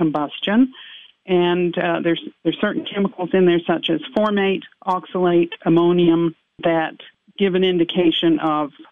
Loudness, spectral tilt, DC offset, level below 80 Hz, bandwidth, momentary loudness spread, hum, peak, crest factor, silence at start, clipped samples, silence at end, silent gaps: -19 LUFS; -8.5 dB/octave; 0.1%; -64 dBFS; 3.9 kHz; 8 LU; none; -4 dBFS; 14 dB; 0 s; under 0.1%; 0.1 s; none